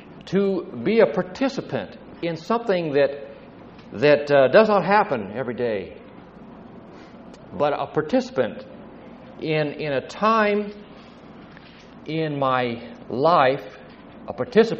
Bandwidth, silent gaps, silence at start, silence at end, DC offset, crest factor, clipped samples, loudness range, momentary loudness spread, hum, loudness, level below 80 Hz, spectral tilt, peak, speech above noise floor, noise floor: 7.6 kHz; none; 0 s; 0 s; under 0.1%; 22 dB; under 0.1%; 8 LU; 25 LU; none; -22 LUFS; -58 dBFS; -4.5 dB/octave; -2 dBFS; 23 dB; -44 dBFS